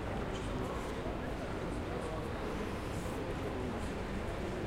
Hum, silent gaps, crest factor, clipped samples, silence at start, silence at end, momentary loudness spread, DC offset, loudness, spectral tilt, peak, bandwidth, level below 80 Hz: none; none; 14 dB; under 0.1%; 0 s; 0 s; 1 LU; under 0.1%; -39 LUFS; -6 dB/octave; -24 dBFS; 16.5 kHz; -46 dBFS